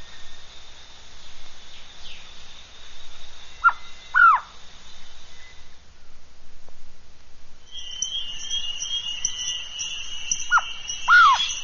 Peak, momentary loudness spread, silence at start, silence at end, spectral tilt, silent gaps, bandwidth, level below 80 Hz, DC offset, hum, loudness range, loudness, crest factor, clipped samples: -6 dBFS; 28 LU; 0 s; 0 s; 3.5 dB/octave; none; 7.2 kHz; -44 dBFS; under 0.1%; none; 19 LU; -21 LUFS; 20 dB; under 0.1%